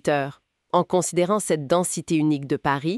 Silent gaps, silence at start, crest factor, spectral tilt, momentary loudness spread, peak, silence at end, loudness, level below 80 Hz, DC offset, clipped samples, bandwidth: none; 0.05 s; 16 dB; -5 dB/octave; 3 LU; -6 dBFS; 0 s; -23 LUFS; -60 dBFS; under 0.1%; under 0.1%; 13.5 kHz